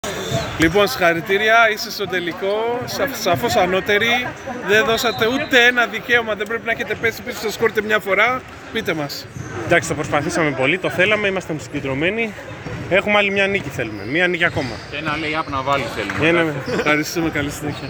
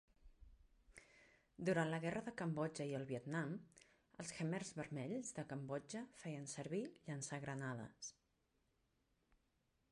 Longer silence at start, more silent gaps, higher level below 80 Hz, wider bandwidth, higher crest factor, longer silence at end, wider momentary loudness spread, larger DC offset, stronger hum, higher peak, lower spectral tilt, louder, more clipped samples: second, 0.05 s vs 0.25 s; neither; first, -46 dBFS vs -76 dBFS; first, over 20 kHz vs 11 kHz; about the same, 18 dB vs 22 dB; second, 0 s vs 1.8 s; second, 10 LU vs 13 LU; neither; neither; first, -2 dBFS vs -26 dBFS; second, -4 dB/octave vs -5.5 dB/octave; first, -18 LUFS vs -46 LUFS; neither